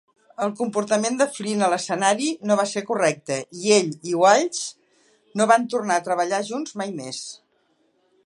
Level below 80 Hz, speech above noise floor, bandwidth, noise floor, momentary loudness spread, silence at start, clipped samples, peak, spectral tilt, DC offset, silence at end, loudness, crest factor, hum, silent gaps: -74 dBFS; 44 dB; 11.5 kHz; -66 dBFS; 12 LU; 0.4 s; under 0.1%; -2 dBFS; -3.5 dB/octave; under 0.1%; 0.9 s; -22 LUFS; 20 dB; none; none